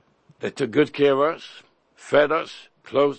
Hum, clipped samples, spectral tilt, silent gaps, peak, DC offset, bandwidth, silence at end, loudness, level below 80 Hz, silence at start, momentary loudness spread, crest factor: none; under 0.1%; -5.5 dB/octave; none; -4 dBFS; under 0.1%; 8.8 kHz; 0 s; -22 LUFS; -66 dBFS; 0.4 s; 17 LU; 20 dB